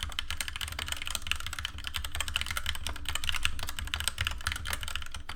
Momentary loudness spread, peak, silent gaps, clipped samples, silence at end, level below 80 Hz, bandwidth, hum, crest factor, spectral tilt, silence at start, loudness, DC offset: 5 LU; -8 dBFS; none; under 0.1%; 0 s; -40 dBFS; 18 kHz; none; 26 dB; -1 dB/octave; 0 s; -34 LUFS; under 0.1%